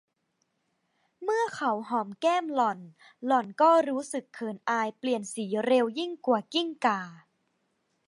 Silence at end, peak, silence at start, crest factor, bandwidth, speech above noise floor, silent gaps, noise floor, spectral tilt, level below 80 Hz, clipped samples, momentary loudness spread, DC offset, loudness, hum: 0.9 s; -10 dBFS; 1.2 s; 20 dB; 11.5 kHz; 49 dB; none; -77 dBFS; -4 dB/octave; -84 dBFS; under 0.1%; 12 LU; under 0.1%; -28 LUFS; none